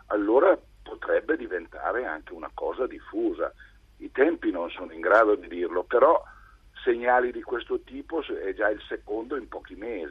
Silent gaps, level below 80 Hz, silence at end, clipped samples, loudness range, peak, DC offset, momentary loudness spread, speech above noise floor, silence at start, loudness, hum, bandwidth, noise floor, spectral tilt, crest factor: none; -54 dBFS; 0 s; under 0.1%; 6 LU; -6 dBFS; under 0.1%; 14 LU; 24 dB; 0.1 s; -26 LUFS; none; 6.4 kHz; -50 dBFS; -6.5 dB/octave; 20 dB